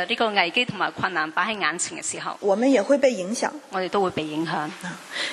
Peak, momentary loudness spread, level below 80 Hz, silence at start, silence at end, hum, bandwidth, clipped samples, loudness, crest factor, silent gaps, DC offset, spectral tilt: -2 dBFS; 9 LU; -66 dBFS; 0 s; 0 s; none; 12.5 kHz; under 0.1%; -23 LUFS; 22 dB; none; under 0.1%; -3 dB/octave